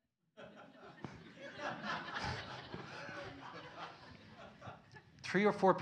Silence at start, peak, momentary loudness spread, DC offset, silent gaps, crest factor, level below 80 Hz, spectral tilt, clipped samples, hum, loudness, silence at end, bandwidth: 0.35 s; -14 dBFS; 23 LU; under 0.1%; none; 26 dB; -68 dBFS; -5.5 dB/octave; under 0.1%; none; -41 LUFS; 0 s; 10 kHz